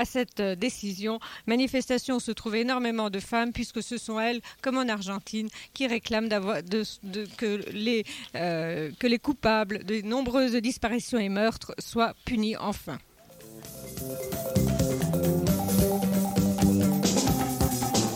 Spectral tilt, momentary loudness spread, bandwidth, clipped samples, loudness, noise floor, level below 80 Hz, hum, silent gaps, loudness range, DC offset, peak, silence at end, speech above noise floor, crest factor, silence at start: -5 dB/octave; 10 LU; 17 kHz; under 0.1%; -28 LUFS; -49 dBFS; -46 dBFS; none; none; 5 LU; under 0.1%; -10 dBFS; 0 s; 20 dB; 18 dB; 0 s